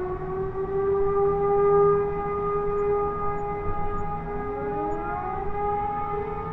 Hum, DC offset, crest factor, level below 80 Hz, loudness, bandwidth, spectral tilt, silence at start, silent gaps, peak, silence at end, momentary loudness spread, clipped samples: none; under 0.1%; 14 dB; -38 dBFS; -26 LUFS; 3.8 kHz; -10 dB/octave; 0 s; none; -10 dBFS; 0 s; 10 LU; under 0.1%